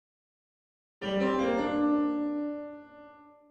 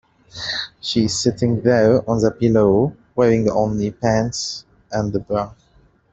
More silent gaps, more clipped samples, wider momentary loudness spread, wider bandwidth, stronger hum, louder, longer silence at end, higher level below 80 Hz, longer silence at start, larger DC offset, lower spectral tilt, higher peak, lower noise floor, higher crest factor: neither; neither; about the same, 13 LU vs 11 LU; about the same, 7.8 kHz vs 8.4 kHz; neither; second, -30 LUFS vs -19 LUFS; second, 0.25 s vs 0.65 s; second, -62 dBFS vs -46 dBFS; first, 1 s vs 0.35 s; neither; about the same, -6.5 dB/octave vs -5.5 dB/octave; second, -16 dBFS vs -2 dBFS; about the same, -53 dBFS vs -55 dBFS; about the same, 14 dB vs 16 dB